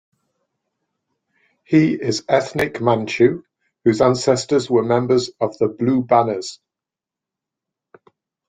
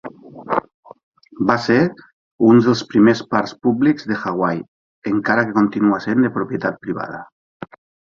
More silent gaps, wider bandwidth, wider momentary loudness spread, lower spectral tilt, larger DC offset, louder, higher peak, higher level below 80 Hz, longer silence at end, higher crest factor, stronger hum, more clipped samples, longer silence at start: second, none vs 0.74-0.83 s, 1.03-1.12 s, 2.13-2.38 s, 4.68-5.02 s, 7.32-7.60 s; first, 11 kHz vs 7.4 kHz; second, 7 LU vs 18 LU; about the same, -6 dB/octave vs -7 dB/octave; neither; about the same, -18 LUFS vs -18 LUFS; about the same, -2 dBFS vs 0 dBFS; about the same, -56 dBFS vs -56 dBFS; first, 1.95 s vs 0.45 s; about the same, 18 dB vs 18 dB; neither; neither; first, 1.7 s vs 0.05 s